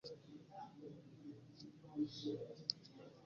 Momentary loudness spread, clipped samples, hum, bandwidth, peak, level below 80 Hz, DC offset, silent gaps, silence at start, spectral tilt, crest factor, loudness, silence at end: 14 LU; under 0.1%; none; 7.2 kHz; -18 dBFS; -84 dBFS; under 0.1%; none; 0.05 s; -5 dB/octave; 32 dB; -49 LUFS; 0 s